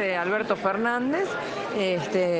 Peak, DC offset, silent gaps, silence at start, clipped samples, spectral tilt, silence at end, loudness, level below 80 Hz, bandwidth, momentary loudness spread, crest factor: -10 dBFS; under 0.1%; none; 0 s; under 0.1%; -5.5 dB/octave; 0 s; -26 LUFS; -64 dBFS; 9.4 kHz; 4 LU; 16 dB